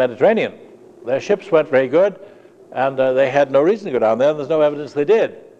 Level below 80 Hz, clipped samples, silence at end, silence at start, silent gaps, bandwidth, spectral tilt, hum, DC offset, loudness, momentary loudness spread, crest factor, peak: -68 dBFS; under 0.1%; 0.2 s; 0 s; none; 7.8 kHz; -6.5 dB/octave; none; under 0.1%; -17 LUFS; 8 LU; 16 dB; -2 dBFS